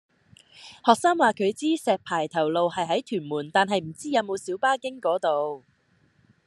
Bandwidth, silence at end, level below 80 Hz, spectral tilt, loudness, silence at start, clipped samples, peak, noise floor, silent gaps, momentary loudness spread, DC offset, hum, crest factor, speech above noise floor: 12.5 kHz; 0.9 s; -74 dBFS; -4.5 dB/octave; -25 LUFS; 0.6 s; under 0.1%; -2 dBFS; -64 dBFS; none; 9 LU; under 0.1%; none; 24 dB; 40 dB